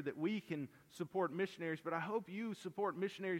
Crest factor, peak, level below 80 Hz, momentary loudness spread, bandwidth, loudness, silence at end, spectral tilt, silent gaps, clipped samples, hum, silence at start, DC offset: 16 dB; -26 dBFS; -86 dBFS; 6 LU; 16.5 kHz; -42 LUFS; 0 s; -6.5 dB/octave; none; under 0.1%; none; 0 s; under 0.1%